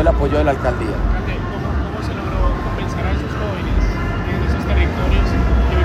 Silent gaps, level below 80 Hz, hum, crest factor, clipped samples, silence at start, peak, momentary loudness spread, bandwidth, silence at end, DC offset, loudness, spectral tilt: none; -20 dBFS; none; 16 dB; under 0.1%; 0 s; -2 dBFS; 6 LU; 8.6 kHz; 0 s; under 0.1%; -19 LUFS; -7.5 dB/octave